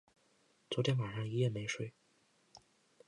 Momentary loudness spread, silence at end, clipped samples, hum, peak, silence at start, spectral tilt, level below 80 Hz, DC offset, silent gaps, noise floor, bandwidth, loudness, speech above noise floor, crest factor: 8 LU; 0.5 s; under 0.1%; none; -20 dBFS; 0.7 s; -5.5 dB/octave; -72 dBFS; under 0.1%; none; -73 dBFS; 10.5 kHz; -37 LUFS; 37 dB; 20 dB